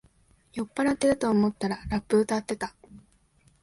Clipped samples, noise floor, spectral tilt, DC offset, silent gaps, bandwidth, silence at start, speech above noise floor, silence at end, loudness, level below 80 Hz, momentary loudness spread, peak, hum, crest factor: under 0.1%; -63 dBFS; -5.5 dB/octave; under 0.1%; none; 11.5 kHz; 0.55 s; 37 dB; 0.65 s; -27 LUFS; -52 dBFS; 12 LU; -10 dBFS; none; 18 dB